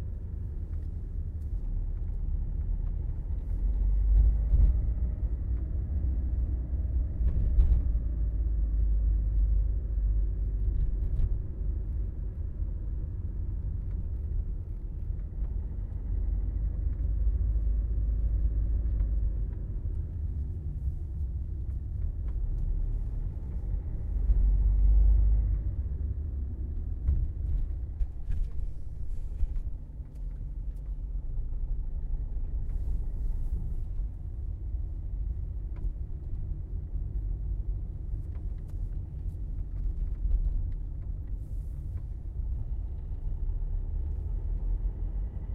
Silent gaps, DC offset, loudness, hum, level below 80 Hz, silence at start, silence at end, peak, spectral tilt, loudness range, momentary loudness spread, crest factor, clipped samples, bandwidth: none; under 0.1%; -34 LUFS; none; -30 dBFS; 0 s; 0 s; -12 dBFS; -11 dB/octave; 8 LU; 10 LU; 18 dB; under 0.1%; 1.7 kHz